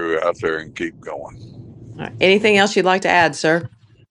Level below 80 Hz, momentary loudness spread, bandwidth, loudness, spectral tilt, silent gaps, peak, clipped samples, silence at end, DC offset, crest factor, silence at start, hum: -54 dBFS; 19 LU; 11 kHz; -17 LUFS; -4 dB/octave; none; 0 dBFS; under 0.1%; 0.45 s; under 0.1%; 18 dB; 0 s; none